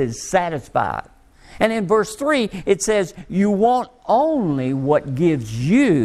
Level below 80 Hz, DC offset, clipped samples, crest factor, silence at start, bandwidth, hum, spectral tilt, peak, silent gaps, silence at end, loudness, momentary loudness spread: -48 dBFS; under 0.1%; under 0.1%; 16 dB; 0 s; 13.5 kHz; none; -6 dB/octave; -2 dBFS; none; 0 s; -19 LUFS; 5 LU